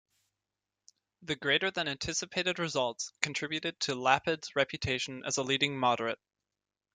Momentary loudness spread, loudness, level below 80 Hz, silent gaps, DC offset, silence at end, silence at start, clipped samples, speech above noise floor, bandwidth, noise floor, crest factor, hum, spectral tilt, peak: 7 LU; -31 LUFS; -64 dBFS; none; under 0.1%; 0.8 s; 1.2 s; under 0.1%; over 58 dB; 10 kHz; under -90 dBFS; 26 dB; 50 Hz at -70 dBFS; -2.5 dB/octave; -8 dBFS